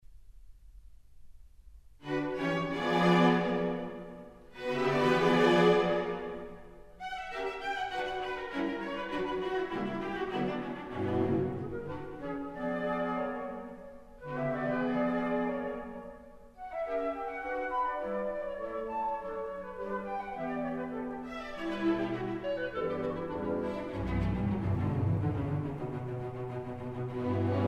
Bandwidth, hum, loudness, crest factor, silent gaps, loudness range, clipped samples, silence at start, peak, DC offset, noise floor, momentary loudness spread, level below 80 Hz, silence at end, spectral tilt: 12.5 kHz; none; -33 LUFS; 20 dB; none; 7 LU; under 0.1%; 0.1 s; -12 dBFS; under 0.1%; -53 dBFS; 14 LU; -52 dBFS; 0 s; -7 dB/octave